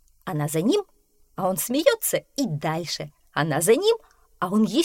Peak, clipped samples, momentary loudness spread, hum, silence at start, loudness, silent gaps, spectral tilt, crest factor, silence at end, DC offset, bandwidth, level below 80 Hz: -4 dBFS; under 0.1%; 11 LU; none; 0.25 s; -24 LUFS; none; -4.5 dB/octave; 20 dB; 0 s; under 0.1%; 17 kHz; -60 dBFS